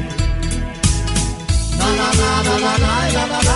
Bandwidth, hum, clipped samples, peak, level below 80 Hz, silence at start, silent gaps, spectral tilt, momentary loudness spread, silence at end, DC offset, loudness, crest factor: 11.5 kHz; none; under 0.1%; -2 dBFS; -22 dBFS; 0 s; none; -4 dB/octave; 6 LU; 0 s; under 0.1%; -17 LUFS; 14 dB